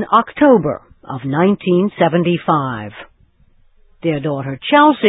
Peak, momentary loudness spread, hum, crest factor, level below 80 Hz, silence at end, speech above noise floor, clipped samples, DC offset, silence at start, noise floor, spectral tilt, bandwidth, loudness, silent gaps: 0 dBFS; 15 LU; none; 16 dB; -52 dBFS; 0 s; 37 dB; under 0.1%; under 0.1%; 0 s; -52 dBFS; -10.5 dB/octave; 4 kHz; -15 LUFS; none